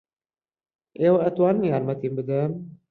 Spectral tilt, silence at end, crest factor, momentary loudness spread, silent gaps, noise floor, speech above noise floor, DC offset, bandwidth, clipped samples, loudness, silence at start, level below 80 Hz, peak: -11 dB/octave; 0.2 s; 16 dB; 8 LU; none; under -90 dBFS; over 67 dB; under 0.1%; 4.5 kHz; under 0.1%; -23 LUFS; 1 s; -66 dBFS; -8 dBFS